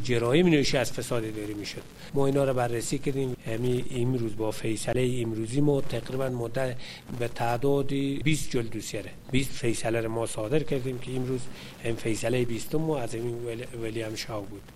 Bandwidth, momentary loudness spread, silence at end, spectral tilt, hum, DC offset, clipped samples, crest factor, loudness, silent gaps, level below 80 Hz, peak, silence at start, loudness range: 16 kHz; 10 LU; 0 s; -5.5 dB/octave; none; under 0.1%; under 0.1%; 20 dB; -29 LUFS; none; -48 dBFS; -8 dBFS; 0 s; 2 LU